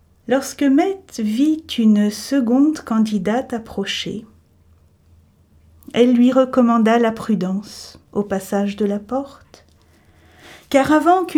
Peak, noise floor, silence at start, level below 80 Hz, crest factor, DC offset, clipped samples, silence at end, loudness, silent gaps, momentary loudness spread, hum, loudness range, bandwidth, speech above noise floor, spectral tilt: 0 dBFS; -53 dBFS; 0.3 s; -54 dBFS; 18 dB; under 0.1%; under 0.1%; 0 s; -18 LUFS; none; 12 LU; none; 7 LU; 16.5 kHz; 36 dB; -5.5 dB/octave